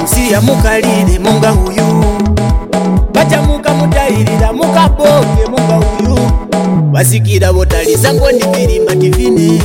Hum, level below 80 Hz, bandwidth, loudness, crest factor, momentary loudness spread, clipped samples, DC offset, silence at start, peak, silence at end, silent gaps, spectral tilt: none; -16 dBFS; 17 kHz; -10 LUFS; 8 dB; 3 LU; under 0.1%; 0.4%; 0 s; 0 dBFS; 0 s; none; -5.5 dB/octave